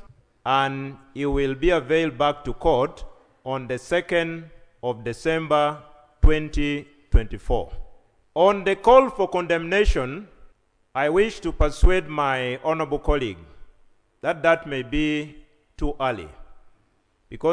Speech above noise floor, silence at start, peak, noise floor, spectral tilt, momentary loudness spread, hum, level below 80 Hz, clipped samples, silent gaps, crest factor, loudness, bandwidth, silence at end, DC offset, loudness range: 43 dB; 0.45 s; 0 dBFS; -64 dBFS; -6 dB/octave; 12 LU; none; -28 dBFS; under 0.1%; none; 22 dB; -23 LUFS; 10.5 kHz; 0 s; under 0.1%; 5 LU